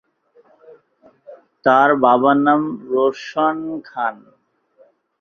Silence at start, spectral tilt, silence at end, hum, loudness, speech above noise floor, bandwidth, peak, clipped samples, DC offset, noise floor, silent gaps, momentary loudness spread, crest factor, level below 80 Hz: 1.3 s; -6.5 dB/octave; 1.05 s; none; -17 LUFS; 39 dB; 7 kHz; -2 dBFS; under 0.1%; under 0.1%; -55 dBFS; none; 11 LU; 18 dB; -66 dBFS